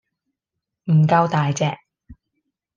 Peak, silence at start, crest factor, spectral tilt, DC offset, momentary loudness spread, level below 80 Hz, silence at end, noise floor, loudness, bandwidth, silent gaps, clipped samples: -6 dBFS; 0.85 s; 16 dB; -6.5 dB/octave; under 0.1%; 17 LU; -58 dBFS; 0.65 s; -83 dBFS; -19 LUFS; 7.4 kHz; none; under 0.1%